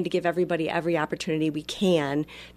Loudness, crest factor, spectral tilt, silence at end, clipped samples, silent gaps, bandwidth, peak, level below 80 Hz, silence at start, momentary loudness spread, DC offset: -26 LUFS; 16 dB; -6 dB/octave; 0.05 s; under 0.1%; none; 14 kHz; -10 dBFS; -58 dBFS; 0 s; 5 LU; under 0.1%